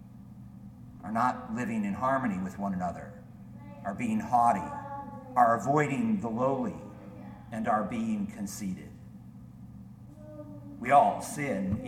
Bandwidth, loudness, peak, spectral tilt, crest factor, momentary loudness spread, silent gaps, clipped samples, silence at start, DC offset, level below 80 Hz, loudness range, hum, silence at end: 15.5 kHz; -30 LUFS; -10 dBFS; -6.5 dB/octave; 20 dB; 24 LU; none; under 0.1%; 0 s; under 0.1%; -58 dBFS; 7 LU; none; 0 s